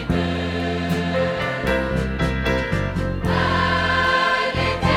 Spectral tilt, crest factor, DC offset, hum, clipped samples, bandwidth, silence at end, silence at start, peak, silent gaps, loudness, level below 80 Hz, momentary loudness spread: -6 dB/octave; 16 dB; under 0.1%; none; under 0.1%; 15.5 kHz; 0 s; 0 s; -6 dBFS; none; -21 LUFS; -32 dBFS; 6 LU